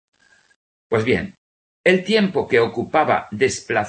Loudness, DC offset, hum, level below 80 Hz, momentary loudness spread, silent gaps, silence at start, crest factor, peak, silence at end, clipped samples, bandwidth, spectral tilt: -19 LUFS; under 0.1%; none; -56 dBFS; 5 LU; 1.38-1.84 s; 0.9 s; 18 dB; -2 dBFS; 0 s; under 0.1%; 8.8 kHz; -5 dB/octave